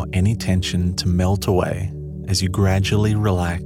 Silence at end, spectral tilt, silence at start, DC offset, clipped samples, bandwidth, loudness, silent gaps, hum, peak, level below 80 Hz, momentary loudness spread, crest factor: 0 s; -6 dB/octave; 0 s; under 0.1%; under 0.1%; 15 kHz; -20 LUFS; none; none; -6 dBFS; -34 dBFS; 6 LU; 14 dB